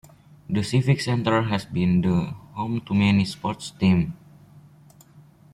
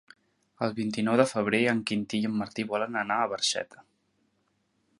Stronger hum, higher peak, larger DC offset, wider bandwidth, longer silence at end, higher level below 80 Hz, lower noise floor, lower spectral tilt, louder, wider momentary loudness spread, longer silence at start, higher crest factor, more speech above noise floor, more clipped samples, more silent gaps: neither; about the same, -8 dBFS vs -6 dBFS; neither; about the same, 12 kHz vs 11.5 kHz; about the same, 1.4 s vs 1.35 s; first, -52 dBFS vs -70 dBFS; second, -51 dBFS vs -73 dBFS; first, -6.5 dB/octave vs -4 dB/octave; first, -23 LUFS vs -28 LUFS; about the same, 10 LU vs 8 LU; about the same, 0.5 s vs 0.6 s; second, 16 dB vs 22 dB; second, 29 dB vs 45 dB; neither; neither